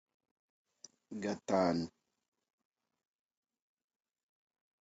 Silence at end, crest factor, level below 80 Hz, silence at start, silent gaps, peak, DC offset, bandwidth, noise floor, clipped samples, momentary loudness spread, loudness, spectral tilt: 2.95 s; 24 dB; -72 dBFS; 1.1 s; none; -18 dBFS; under 0.1%; 7.6 kHz; -57 dBFS; under 0.1%; 14 LU; -36 LUFS; -5.5 dB/octave